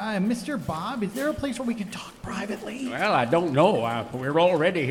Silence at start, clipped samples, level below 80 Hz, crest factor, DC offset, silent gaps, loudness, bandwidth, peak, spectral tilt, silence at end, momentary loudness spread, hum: 0 s; under 0.1%; -54 dBFS; 18 dB; under 0.1%; none; -25 LUFS; 18 kHz; -8 dBFS; -6 dB/octave; 0 s; 11 LU; none